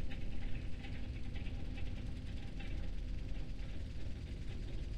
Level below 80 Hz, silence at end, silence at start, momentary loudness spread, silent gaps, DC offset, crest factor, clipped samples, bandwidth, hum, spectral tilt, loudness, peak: -44 dBFS; 0 s; 0 s; 1 LU; none; under 0.1%; 12 dB; under 0.1%; 9.4 kHz; none; -6.5 dB/octave; -47 LUFS; -26 dBFS